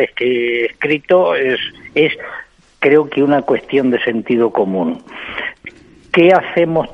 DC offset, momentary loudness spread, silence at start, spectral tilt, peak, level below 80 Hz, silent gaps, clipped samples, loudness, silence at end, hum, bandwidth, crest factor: under 0.1%; 14 LU; 0 s; -7.5 dB/octave; 0 dBFS; -54 dBFS; none; under 0.1%; -15 LUFS; 0 s; none; 6.6 kHz; 16 dB